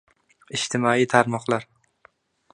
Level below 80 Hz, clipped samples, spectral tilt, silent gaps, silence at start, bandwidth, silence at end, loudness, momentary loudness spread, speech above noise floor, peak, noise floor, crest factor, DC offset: -66 dBFS; under 0.1%; -4.5 dB/octave; none; 0.5 s; 10.5 kHz; 0.9 s; -22 LUFS; 9 LU; 37 dB; 0 dBFS; -59 dBFS; 24 dB; under 0.1%